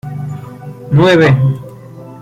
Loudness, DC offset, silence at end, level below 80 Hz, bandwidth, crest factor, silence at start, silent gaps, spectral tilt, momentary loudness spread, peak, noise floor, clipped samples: -10 LUFS; under 0.1%; 0 s; -44 dBFS; 9.2 kHz; 12 dB; 0.05 s; none; -7.5 dB/octave; 24 LU; 0 dBFS; -32 dBFS; under 0.1%